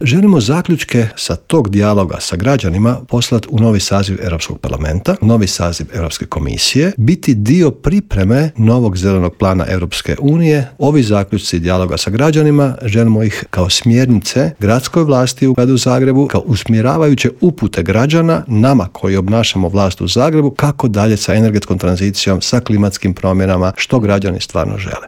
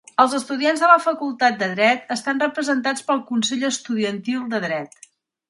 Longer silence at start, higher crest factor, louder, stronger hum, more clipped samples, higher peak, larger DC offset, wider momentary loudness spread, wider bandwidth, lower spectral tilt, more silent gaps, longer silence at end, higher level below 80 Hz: second, 0 s vs 0.2 s; second, 12 dB vs 20 dB; first, -13 LUFS vs -20 LUFS; neither; neither; about the same, 0 dBFS vs 0 dBFS; neither; second, 6 LU vs 9 LU; first, 16.5 kHz vs 11.5 kHz; first, -6 dB/octave vs -3.5 dB/octave; neither; second, 0 s vs 0.65 s; first, -34 dBFS vs -72 dBFS